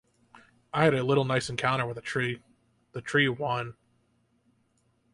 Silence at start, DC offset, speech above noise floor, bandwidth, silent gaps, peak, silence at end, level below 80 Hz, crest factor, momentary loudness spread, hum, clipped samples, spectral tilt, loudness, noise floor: 0.75 s; under 0.1%; 43 dB; 11.5 kHz; none; -8 dBFS; 1.4 s; -64 dBFS; 22 dB; 16 LU; none; under 0.1%; -5.5 dB/octave; -27 LUFS; -70 dBFS